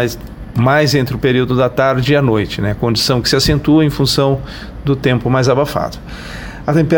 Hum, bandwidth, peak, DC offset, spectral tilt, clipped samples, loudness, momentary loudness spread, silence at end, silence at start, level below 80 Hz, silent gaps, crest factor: none; 17 kHz; 0 dBFS; 0.1%; -5.5 dB/octave; under 0.1%; -14 LUFS; 12 LU; 0 s; 0 s; -32 dBFS; none; 14 dB